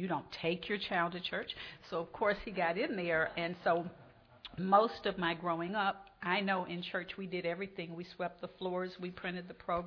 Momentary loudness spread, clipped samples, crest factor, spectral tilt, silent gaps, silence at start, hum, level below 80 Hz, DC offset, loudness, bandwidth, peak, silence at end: 9 LU; under 0.1%; 24 dB; -7 dB/octave; none; 0 s; none; -66 dBFS; under 0.1%; -36 LUFS; 5.4 kHz; -14 dBFS; 0 s